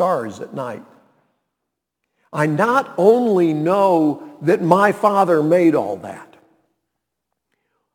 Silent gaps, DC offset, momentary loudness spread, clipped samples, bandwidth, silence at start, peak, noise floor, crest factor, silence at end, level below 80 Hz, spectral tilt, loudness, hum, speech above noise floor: none; under 0.1%; 15 LU; under 0.1%; 18.5 kHz; 0 s; 0 dBFS; -79 dBFS; 18 dB; 1.7 s; -72 dBFS; -7 dB/octave; -16 LUFS; none; 63 dB